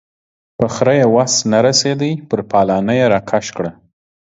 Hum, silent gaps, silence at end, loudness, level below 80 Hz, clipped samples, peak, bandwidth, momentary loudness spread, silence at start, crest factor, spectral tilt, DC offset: none; none; 0.55 s; -14 LUFS; -50 dBFS; under 0.1%; 0 dBFS; 8 kHz; 9 LU; 0.6 s; 16 dB; -4.5 dB/octave; under 0.1%